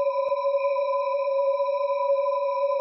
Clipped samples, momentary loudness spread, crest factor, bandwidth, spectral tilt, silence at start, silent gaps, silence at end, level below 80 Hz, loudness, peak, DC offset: under 0.1%; 1 LU; 10 dB; 5.8 kHz; -4 dB/octave; 0 s; none; 0 s; -86 dBFS; -25 LUFS; -14 dBFS; under 0.1%